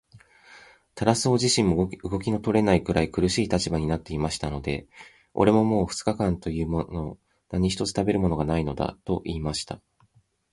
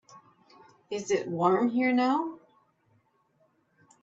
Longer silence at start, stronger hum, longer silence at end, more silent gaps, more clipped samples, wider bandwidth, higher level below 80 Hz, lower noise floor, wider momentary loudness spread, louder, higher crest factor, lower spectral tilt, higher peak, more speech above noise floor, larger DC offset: about the same, 0.15 s vs 0.15 s; neither; second, 0.75 s vs 1.65 s; neither; neither; first, 11.5 kHz vs 7.8 kHz; first, -42 dBFS vs -76 dBFS; second, -63 dBFS vs -69 dBFS; about the same, 11 LU vs 13 LU; about the same, -25 LUFS vs -27 LUFS; about the same, 22 dB vs 18 dB; about the same, -5.5 dB/octave vs -5.5 dB/octave; first, -4 dBFS vs -12 dBFS; second, 39 dB vs 43 dB; neither